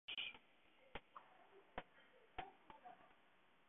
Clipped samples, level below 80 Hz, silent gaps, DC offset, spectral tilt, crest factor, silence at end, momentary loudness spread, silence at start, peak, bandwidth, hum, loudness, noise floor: under 0.1%; -76 dBFS; none; under 0.1%; 1 dB/octave; 24 dB; 0 s; 18 LU; 0.05 s; -34 dBFS; 3.9 kHz; none; -56 LUFS; -75 dBFS